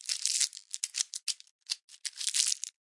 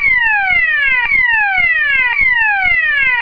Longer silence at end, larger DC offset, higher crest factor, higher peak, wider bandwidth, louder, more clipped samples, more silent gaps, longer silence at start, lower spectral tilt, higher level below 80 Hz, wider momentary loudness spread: first, 0.15 s vs 0 s; neither; first, 28 dB vs 10 dB; second, -6 dBFS vs -2 dBFS; first, 11.5 kHz vs 5.4 kHz; second, -31 LUFS vs -10 LUFS; neither; first, 1.51-1.59 s, 1.84-1.88 s vs none; about the same, 0.05 s vs 0 s; second, 9.5 dB/octave vs -3.5 dB/octave; second, under -90 dBFS vs -36 dBFS; first, 10 LU vs 1 LU